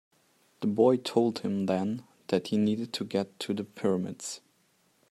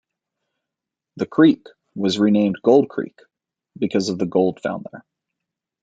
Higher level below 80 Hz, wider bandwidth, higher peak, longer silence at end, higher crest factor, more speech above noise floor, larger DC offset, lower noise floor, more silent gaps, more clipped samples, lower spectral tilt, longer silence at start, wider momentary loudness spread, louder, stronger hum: second, -76 dBFS vs -66 dBFS; first, 13.5 kHz vs 7.8 kHz; second, -10 dBFS vs -2 dBFS; about the same, 0.75 s vs 0.8 s; about the same, 20 dB vs 20 dB; second, 40 dB vs 67 dB; neither; second, -69 dBFS vs -85 dBFS; neither; neither; about the same, -6 dB/octave vs -6.5 dB/octave; second, 0.6 s vs 1.15 s; second, 12 LU vs 15 LU; second, -30 LUFS vs -19 LUFS; neither